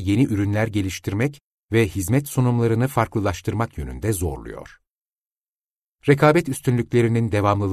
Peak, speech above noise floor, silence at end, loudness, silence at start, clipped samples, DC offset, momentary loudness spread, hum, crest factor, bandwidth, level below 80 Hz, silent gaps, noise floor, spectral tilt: -4 dBFS; over 70 dB; 0 s; -21 LUFS; 0 s; under 0.1%; under 0.1%; 10 LU; none; 18 dB; 13.5 kHz; -42 dBFS; 1.43-1.67 s, 4.97-5.01 s, 5.12-5.22 s; under -90 dBFS; -6.5 dB/octave